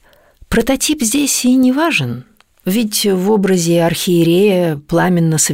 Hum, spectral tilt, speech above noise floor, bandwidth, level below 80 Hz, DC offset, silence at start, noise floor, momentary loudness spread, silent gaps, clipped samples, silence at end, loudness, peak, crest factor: none; -4.5 dB/octave; 32 dB; 16.5 kHz; -40 dBFS; 0.3%; 0.5 s; -45 dBFS; 6 LU; none; under 0.1%; 0 s; -14 LUFS; -2 dBFS; 12 dB